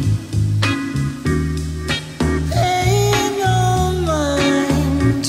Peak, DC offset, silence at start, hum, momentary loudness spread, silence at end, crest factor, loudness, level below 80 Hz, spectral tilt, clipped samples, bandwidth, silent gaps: -4 dBFS; under 0.1%; 0 s; none; 6 LU; 0 s; 12 dB; -18 LUFS; -28 dBFS; -5.5 dB/octave; under 0.1%; 16 kHz; none